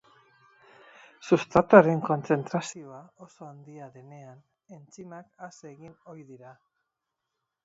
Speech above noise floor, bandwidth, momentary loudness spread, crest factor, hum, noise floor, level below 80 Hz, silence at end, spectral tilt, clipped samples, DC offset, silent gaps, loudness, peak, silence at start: 57 dB; 8 kHz; 29 LU; 28 dB; none; -84 dBFS; -62 dBFS; 1.5 s; -6.5 dB/octave; under 0.1%; under 0.1%; none; -23 LUFS; -2 dBFS; 1.25 s